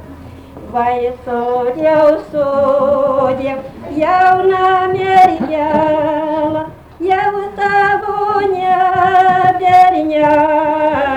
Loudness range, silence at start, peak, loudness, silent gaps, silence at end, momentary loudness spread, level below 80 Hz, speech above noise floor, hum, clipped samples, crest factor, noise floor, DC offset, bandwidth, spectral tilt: 3 LU; 0 s; 0 dBFS; -13 LUFS; none; 0 s; 9 LU; -44 dBFS; 21 dB; none; under 0.1%; 12 dB; -33 dBFS; under 0.1%; 9.4 kHz; -6.5 dB/octave